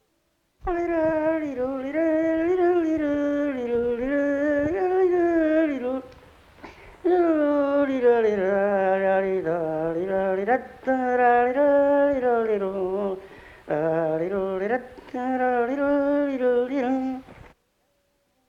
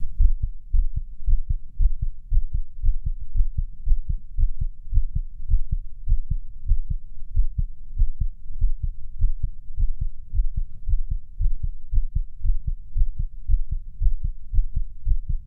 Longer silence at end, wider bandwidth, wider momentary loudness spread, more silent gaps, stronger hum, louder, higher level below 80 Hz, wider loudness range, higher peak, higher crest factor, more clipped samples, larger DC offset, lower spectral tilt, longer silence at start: first, 1.1 s vs 0 s; first, 7.2 kHz vs 0.3 kHz; about the same, 8 LU vs 6 LU; neither; neither; first, -23 LUFS vs -31 LUFS; second, -52 dBFS vs -22 dBFS; about the same, 3 LU vs 2 LU; second, -8 dBFS vs -4 dBFS; about the same, 14 dB vs 16 dB; neither; neither; second, -8 dB/octave vs -12.5 dB/octave; first, 0.65 s vs 0 s